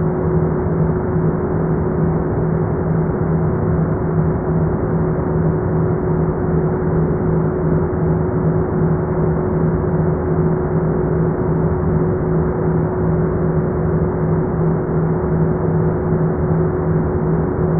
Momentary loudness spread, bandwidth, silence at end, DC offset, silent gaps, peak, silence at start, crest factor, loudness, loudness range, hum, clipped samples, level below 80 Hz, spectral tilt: 1 LU; 2.4 kHz; 0 s; under 0.1%; none; -4 dBFS; 0 s; 12 dB; -18 LUFS; 0 LU; none; under 0.1%; -30 dBFS; -14.5 dB/octave